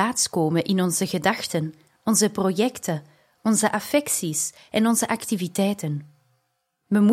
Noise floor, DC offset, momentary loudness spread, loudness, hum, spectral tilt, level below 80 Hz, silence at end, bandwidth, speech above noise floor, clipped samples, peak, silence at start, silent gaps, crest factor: -74 dBFS; under 0.1%; 9 LU; -23 LUFS; none; -4 dB/octave; -66 dBFS; 0 s; 16.5 kHz; 51 dB; under 0.1%; -6 dBFS; 0 s; none; 18 dB